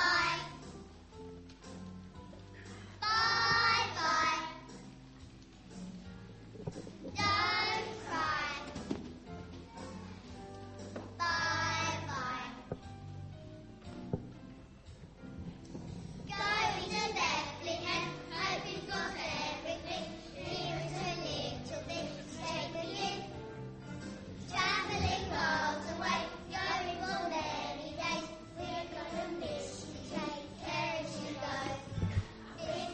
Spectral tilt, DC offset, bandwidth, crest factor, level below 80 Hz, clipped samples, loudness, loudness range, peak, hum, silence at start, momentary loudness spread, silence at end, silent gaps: -3.5 dB/octave; under 0.1%; 8.4 kHz; 20 dB; -56 dBFS; under 0.1%; -36 LUFS; 8 LU; -18 dBFS; none; 0 s; 20 LU; 0 s; none